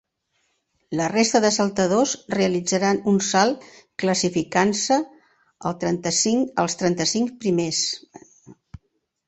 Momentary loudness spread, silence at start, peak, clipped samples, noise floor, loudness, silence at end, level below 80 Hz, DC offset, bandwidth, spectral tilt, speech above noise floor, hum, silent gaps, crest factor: 8 LU; 0.9 s; -4 dBFS; under 0.1%; -71 dBFS; -21 LUFS; 0.75 s; -60 dBFS; under 0.1%; 8.4 kHz; -3.5 dB/octave; 50 dB; none; none; 20 dB